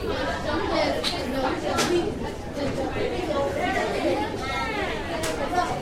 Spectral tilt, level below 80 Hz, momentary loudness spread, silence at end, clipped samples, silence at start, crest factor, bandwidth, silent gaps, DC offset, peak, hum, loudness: -4.5 dB/octave; -40 dBFS; 4 LU; 0 s; under 0.1%; 0 s; 16 dB; 16 kHz; none; under 0.1%; -10 dBFS; none; -26 LUFS